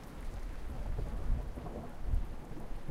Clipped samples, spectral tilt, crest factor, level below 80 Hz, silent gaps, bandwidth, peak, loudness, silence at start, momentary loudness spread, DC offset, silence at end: under 0.1%; -7 dB/octave; 16 dB; -38 dBFS; none; 13 kHz; -22 dBFS; -43 LUFS; 0 s; 7 LU; under 0.1%; 0 s